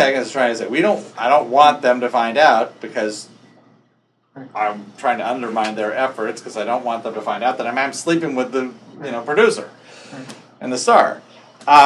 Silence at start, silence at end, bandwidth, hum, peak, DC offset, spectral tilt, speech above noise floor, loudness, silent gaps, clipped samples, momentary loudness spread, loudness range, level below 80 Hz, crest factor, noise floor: 0 s; 0 s; 12 kHz; none; 0 dBFS; under 0.1%; -3.5 dB/octave; 44 dB; -18 LUFS; none; under 0.1%; 18 LU; 7 LU; -72 dBFS; 18 dB; -62 dBFS